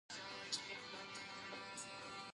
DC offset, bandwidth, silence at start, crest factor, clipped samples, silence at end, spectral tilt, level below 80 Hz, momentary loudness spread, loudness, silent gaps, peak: under 0.1%; 11.5 kHz; 0.1 s; 22 dB; under 0.1%; 0 s; -1 dB/octave; -82 dBFS; 5 LU; -48 LUFS; none; -28 dBFS